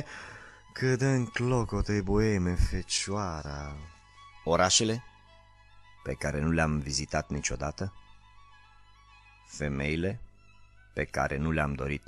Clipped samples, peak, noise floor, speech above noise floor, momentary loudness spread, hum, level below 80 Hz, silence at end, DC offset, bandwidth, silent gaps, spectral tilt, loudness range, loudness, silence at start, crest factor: under 0.1%; -10 dBFS; -57 dBFS; 27 dB; 16 LU; 50 Hz at -55 dBFS; -40 dBFS; 0.1 s; under 0.1%; 12.5 kHz; none; -4.5 dB/octave; 7 LU; -30 LUFS; 0 s; 22 dB